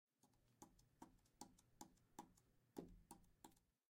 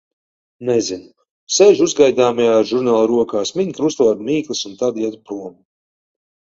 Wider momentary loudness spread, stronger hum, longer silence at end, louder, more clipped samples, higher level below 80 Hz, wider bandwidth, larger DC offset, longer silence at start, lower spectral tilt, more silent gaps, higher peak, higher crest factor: second, 8 LU vs 15 LU; neither; second, 0.2 s vs 0.95 s; second, -66 LUFS vs -16 LUFS; neither; second, -78 dBFS vs -60 dBFS; first, 16 kHz vs 7.8 kHz; neither; second, 0.2 s vs 0.6 s; about the same, -4.5 dB/octave vs -4 dB/octave; second, none vs 1.30-1.47 s; second, -40 dBFS vs 0 dBFS; first, 28 dB vs 16 dB